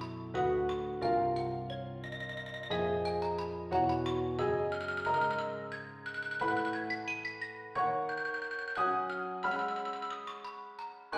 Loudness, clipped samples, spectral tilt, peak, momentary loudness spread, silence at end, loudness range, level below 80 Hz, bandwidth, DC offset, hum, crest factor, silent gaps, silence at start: -34 LUFS; under 0.1%; -6.5 dB/octave; -20 dBFS; 10 LU; 0 s; 2 LU; -60 dBFS; 9.8 kHz; under 0.1%; none; 16 dB; none; 0 s